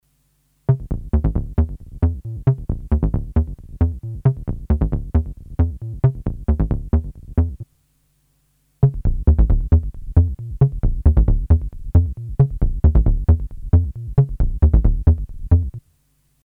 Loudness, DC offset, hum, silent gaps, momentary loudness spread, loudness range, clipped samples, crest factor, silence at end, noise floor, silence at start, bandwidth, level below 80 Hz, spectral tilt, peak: -20 LUFS; under 0.1%; none; none; 6 LU; 4 LU; under 0.1%; 18 dB; 0.65 s; -63 dBFS; 0.7 s; 2.4 kHz; -20 dBFS; -12 dB/octave; 0 dBFS